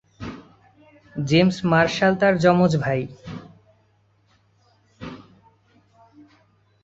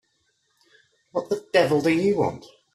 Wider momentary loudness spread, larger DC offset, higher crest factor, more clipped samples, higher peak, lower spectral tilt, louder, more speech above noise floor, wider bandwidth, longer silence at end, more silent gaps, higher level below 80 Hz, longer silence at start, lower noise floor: first, 22 LU vs 11 LU; neither; about the same, 20 dB vs 20 dB; neither; about the same, -4 dBFS vs -4 dBFS; about the same, -6.5 dB/octave vs -6 dB/octave; first, -19 LUFS vs -23 LUFS; second, 43 dB vs 48 dB; second, 8 kHz vs 14 kHz; first, 1.65 s vs 0.3 s; neither; first, -54 dBFS vs -62 dBFS; second, 0.2 s vs 1.15 s; second, -62 dBFS vs -70 dBFS